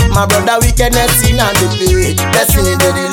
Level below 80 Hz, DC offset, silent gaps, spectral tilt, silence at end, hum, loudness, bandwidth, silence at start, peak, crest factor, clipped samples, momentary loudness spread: -18 dBFS; under 0.1%; none; -4 dB/octave; 0 s; none; -10 LUFS; 18.5 kHz; 0 s; 0 dBFS; 10 dB; under 0.1%; 2 LU